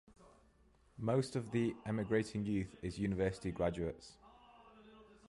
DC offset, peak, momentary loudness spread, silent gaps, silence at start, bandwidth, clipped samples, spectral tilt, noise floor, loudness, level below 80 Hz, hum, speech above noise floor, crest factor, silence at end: under 0.1%; -22 dBFS; 8 LU; none; 0.2 s; 11.5 kHz; under 0.1%; -7 dB/octave; -69 dBFS; -38 LUFS; -58 dBFS; none; 31 dB; 18 dB; 0.15 s